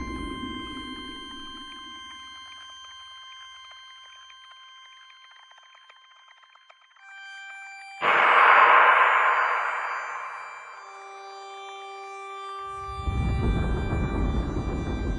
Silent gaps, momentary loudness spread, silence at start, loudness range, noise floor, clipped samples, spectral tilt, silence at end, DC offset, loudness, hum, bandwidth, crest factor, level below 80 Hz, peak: none; 26 LU; 0 s; 24 LU; -56 dBFS; under 0.1%; -5.5 dB/octave; 0 s; under 0.1%; -23 LUFS; none; 11 kHz; 22 dB; -38 dBFS; -4 dBFS